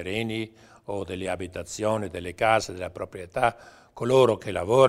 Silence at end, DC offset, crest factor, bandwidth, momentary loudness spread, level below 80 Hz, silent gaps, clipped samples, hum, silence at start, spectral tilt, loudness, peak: 0 s; under 0.1%; 20 dB; 15 kHz; 14 LU; -54 dBFS; none; under 0.1%; none; 0 s; -5 dB/octave; -27 LUFS; -6 dBFS